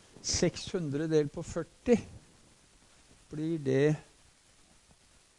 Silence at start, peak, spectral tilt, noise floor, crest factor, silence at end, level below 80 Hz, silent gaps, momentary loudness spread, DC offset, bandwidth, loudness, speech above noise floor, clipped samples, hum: 0.15 s; -12 dBFS; -5 dB/octave; -63 dBFS; 22 dB; 1.35 s; -56 dBFS; none; 10 LU; under 0.1%; 11.5 kHz; -31 LUFS; 32 dB; under 0.1%; none